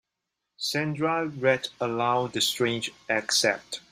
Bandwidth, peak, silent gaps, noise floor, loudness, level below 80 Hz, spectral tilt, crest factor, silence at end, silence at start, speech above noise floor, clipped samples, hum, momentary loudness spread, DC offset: 16 kHz; -8 dBFS; none; -84 dBFS; -26 LUFS; -68 dBFS; -3 dB/octave; 20 dB; 0.1 s; 0.6 s; 57 dB; under 0.1%; none; 7 LU; under 0.1%